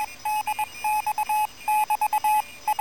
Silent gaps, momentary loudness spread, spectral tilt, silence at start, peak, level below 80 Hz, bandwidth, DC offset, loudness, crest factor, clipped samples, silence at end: none; 5 LU; 0 dB/octave; 0 s; -16 dBFS; -62 dBFS; 17.5 kHz; 0.4%; -25 LUFS; 10 dB; under 0.1%; 0 s